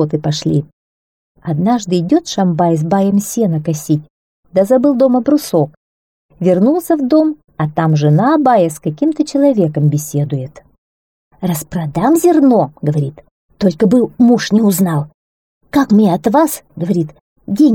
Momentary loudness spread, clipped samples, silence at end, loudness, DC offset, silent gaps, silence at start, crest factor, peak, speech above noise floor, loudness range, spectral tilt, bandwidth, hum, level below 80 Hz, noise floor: 9 LU; under 0.1%; 0 s; -14 LUFS; 0.1%; 0.73-1.35 s, 4.10-4.43 s, 5.77-6.29 s, 10.78-11.31 s, 13.31-13.49 s, 15.14-15.61 s, 17.21-17.36 s; 0 s; 12 dB; -2 dBFS; over 78 dB; 3 LU; -7 dB/octave; 18.5 kHz; none; -50 dBFS; under -90 dBFS